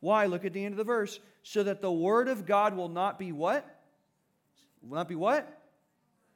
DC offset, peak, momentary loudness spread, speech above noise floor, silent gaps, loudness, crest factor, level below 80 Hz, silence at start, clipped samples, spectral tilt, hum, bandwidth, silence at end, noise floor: under 0.1%; -14 dBFS; 10 LU; 45 dB; none; -30 LUFS; 16 dB; -88 dBFS; 0 s; under 0.1%; -6 dB/octave; none; 18 kHz; 0.8 s; -75 dBFS